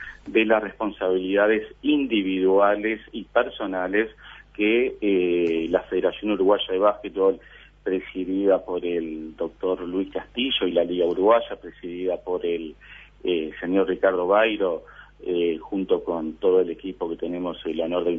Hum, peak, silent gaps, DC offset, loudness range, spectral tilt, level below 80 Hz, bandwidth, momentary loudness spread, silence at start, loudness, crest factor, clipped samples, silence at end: 50 Hz at -55 dBFS; -6 dBFS; none; under 0.1%; 3 LU; -7.5 dB/octave; -54 dBFS; 3.7 kHz; 11 LU; 0 s; -24 LUFS; 18 dB; under 0.1%; 0 s